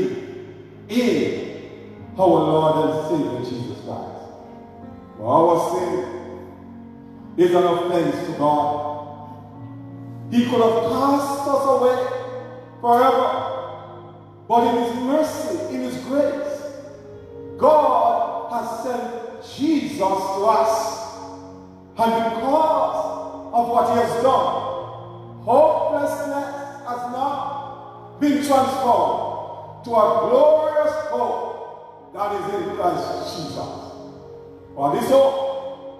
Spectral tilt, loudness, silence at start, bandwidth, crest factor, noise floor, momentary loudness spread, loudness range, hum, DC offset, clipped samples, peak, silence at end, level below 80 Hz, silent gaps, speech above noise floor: -6 dB/octave; -20 LUFS; 0 s; 14.5 kHz; 18 dB; -42 dBFS; 22 LU; 4 LU; none; under 0.1%; under 0.1%; -4 dBFS; 0 s; -60 dBFS; none; 23 dB